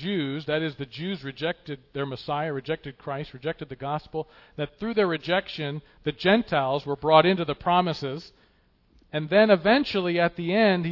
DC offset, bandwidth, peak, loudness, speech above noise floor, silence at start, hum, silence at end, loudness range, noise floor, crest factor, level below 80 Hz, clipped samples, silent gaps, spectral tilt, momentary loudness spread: under 0.1%; 6 kHz; -4 dBFS; -25 LUFS; 38 dB; 0 s; none; 0 s; 8 LU; -63 dBFS; 22 dB; -58 dBFS; under 0.1%; none; -7.5 dB/octave; 15 LU